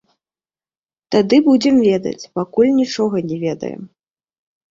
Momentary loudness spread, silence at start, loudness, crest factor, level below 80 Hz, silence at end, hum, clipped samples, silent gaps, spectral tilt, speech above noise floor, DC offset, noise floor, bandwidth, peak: 12 LU; 1.1 s; -16 LUFS; 16 dB; -58 dBFS; 0.85 s; none; under 0.1%; none; -6 dB/octave; over 75 dB; under 0.1%; under -90 dBFS; 7.6 kHz; -2 dBFS